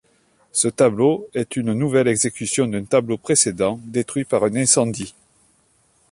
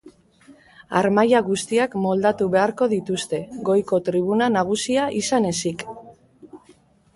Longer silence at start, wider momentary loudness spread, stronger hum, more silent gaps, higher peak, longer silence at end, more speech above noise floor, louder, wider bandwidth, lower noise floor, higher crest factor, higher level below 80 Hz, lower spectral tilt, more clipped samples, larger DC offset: first, 0.55 s vs 0.05 s; about the same, 8 LU vs 8 LU; neither; neither; about the same, -2 dBFS vs -4 dBFS; first, 1 s vs 0.6 s; first, 41 dB vs 34 dB; about the same, -19 LUFS vs -21 LUFS; about the same, 11.5 kHz vs 11.5 kHz; first, -61 dBFS vs -55 dBFS; about the same, 18 dB vs 18 dB; about the same, -56 dBFS vs -60 dBFS; about the same, -4 dB/octave vs -5 dB/octave; neither; neither